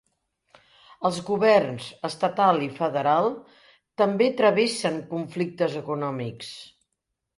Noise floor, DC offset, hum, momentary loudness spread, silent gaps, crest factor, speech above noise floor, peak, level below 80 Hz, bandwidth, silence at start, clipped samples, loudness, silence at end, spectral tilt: -81 dBFS; under 0.1%; none; 14 LU; none; 20 dB; 57 dB; -6 dBFS; -68 dBFS; 11.5 kHz; 1 s; under 0.1%; -24 LUFS; 0.7 s; -5.5 dB/octave